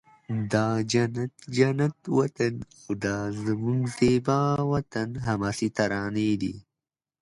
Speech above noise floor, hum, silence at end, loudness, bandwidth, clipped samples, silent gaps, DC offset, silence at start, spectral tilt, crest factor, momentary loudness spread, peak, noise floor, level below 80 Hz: over 64 dB; none; 0.6 s; -27 LUFS; 11.5 kHz; under 0.1%; none; under 0.1%; 0.3 s; -6.5 dB/octave; 18 dB; 9 LU; -8 dBFS; under -90 dBFS; -54 dBFS